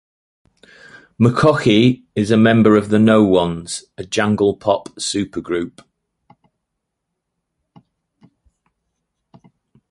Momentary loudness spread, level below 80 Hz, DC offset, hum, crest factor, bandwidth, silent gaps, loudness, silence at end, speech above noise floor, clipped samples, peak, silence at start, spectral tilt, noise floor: 12 LU; -50 dBFS; under 0.1%; none; 18 dB; 11.5 kHz; none; -16 LUFS; 4.2 s; 62 dB; under 0.1%; -2 dBFS; 1.2 s; -6 dB/octave; -77 dBFS